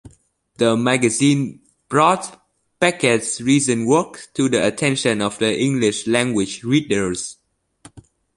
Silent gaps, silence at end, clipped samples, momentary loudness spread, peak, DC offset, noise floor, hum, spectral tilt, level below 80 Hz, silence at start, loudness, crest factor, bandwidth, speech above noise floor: none; 0.35 s; under 0.1%; 7 LU; -2 dBFS; under 0.1%; -57 dBFS; none; -4.5 dB/octave; -54 dBFS; 0.05 s; -18 LUFS; 18 dB; 11.5 kHz; 39 dB